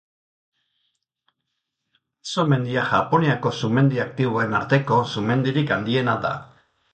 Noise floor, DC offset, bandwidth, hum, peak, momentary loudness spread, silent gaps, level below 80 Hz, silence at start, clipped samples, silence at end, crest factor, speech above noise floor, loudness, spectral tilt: -79 dBFS; under 0.1%; 8.8 kHz; none; -4 dBFS; 5 LU; none; -58 dBFS; 2.25 s; under 0.1%; 0.5 s; 18 dB; 58 dB; -21 LUFS; -6.5 dB/octave